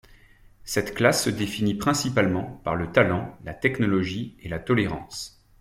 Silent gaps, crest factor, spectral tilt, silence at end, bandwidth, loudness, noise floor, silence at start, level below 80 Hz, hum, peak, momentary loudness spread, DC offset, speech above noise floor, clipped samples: none; 20 dB; -5 dB/octave; 0.3 s; 16.5 kHz; -24 LUFS; -52 dBFS; 0.65 s; -50 dBFS; none; -6 dBFS; 12 LU; under 0.1%; 28 dB; under 0.1%